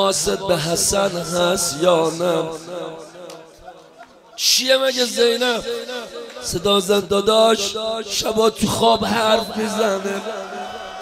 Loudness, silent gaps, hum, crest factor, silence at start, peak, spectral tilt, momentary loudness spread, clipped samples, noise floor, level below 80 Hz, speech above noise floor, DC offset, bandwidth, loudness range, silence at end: -18 LUFS; none; none; 18 dB; 0 s; -2 dBFS; -3 dB/octave; 15 LU; under 0.1%; -45 dBFS; -48 dBFS; 26 dB; under 0.1%; 16 kHz; 3 LU; 0 s